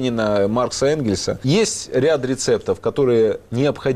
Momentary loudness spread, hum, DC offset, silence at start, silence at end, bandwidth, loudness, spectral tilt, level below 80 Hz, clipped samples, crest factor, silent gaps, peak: 4 LU; none; under 0.1%; 0 s; 0 s; 14 kHz; -19 LUFS; -5 dB/octave; -48 dBFS; under 0.1%; 10 dB; none; -8 dBFS